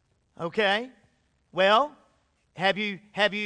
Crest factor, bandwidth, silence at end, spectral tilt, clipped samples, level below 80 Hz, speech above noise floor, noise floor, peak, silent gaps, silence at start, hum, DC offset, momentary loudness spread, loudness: 20 dB; 10 kHz; 0 s; -4.5 dB/octave; under 0.1%; -70 dBFS; 43 dB; -68 dBFS; -8 dBFS; none; 0.4 s; none; under 0.1%; 14 LU; -26 LUFS